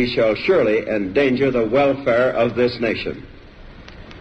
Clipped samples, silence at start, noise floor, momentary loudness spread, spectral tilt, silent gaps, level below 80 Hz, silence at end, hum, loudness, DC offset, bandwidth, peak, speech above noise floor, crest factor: under 0.1%; 0 s; -40 dBFS; 6 LU; -7 dB/octave; none; -44 dBFS; 0 s; none; -18 LUFS; under 0.1%; 8 kHz; -6 dBFS; 22 dB; 12 dB